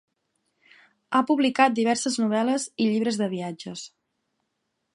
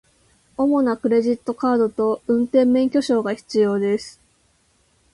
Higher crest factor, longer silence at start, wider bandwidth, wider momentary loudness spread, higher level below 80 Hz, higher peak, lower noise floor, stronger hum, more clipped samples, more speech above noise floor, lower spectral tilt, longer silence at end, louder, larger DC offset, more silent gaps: first, 22 dB vs 16 dB; first, 1.1 s vs 0.6 s; about the same, 11.5 kHz vs 11.5 kHz; first, 16 LU vs 6 LU; second, -76 dBFS vs -60 dBFS; about the same, -4 dBFS vs -6 dBFS; first, -78 dBFS vs -62 dBFS; neither; neither; first, 54 dB vs 43 dB; second, -4 dB/octave vs -6.5 dB/octave; about the same, 1.1 s vs 1.05 s; second, -24 LUFS vs -20 LUFS; neither; neither